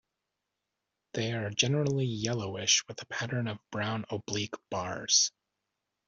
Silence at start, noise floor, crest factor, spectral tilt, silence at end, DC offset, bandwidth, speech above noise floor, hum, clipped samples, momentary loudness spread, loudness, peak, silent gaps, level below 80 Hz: 1.15 s; -86 dBFS; 22 dB; -3 dB/octave; 0.8 s; under 0.1%; 7.8 kHz; 54 dB; none; under 0.1%; 11 LU; -30 LUFS; -10 dBFS; none; -68 dBFS